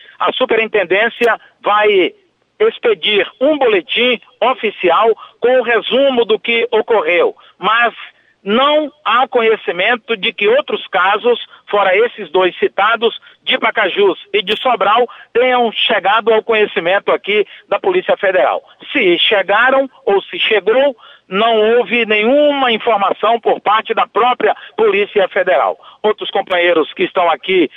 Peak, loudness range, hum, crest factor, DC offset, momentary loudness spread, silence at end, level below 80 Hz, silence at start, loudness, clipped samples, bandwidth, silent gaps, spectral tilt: -4 dBFS; 1 LU; none; 10 dB; under 0.1%; 5 LU; 0.1 s; -62 dBFS; 0.2 s; -13 LUFS; under 0.1%; 5.6 kHz; none; -5.5 dB/octave